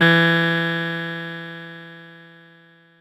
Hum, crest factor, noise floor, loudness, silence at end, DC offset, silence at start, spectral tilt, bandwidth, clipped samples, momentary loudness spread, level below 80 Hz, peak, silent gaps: none; 18 dB; -52 dBFS; -20 LUFS; 0.8 s; under 0.1%; 0 s; -6.5 dB/octave; 14 kHz; under 0.1%; 24 LU; -76 dBFS; -4 dBFS; none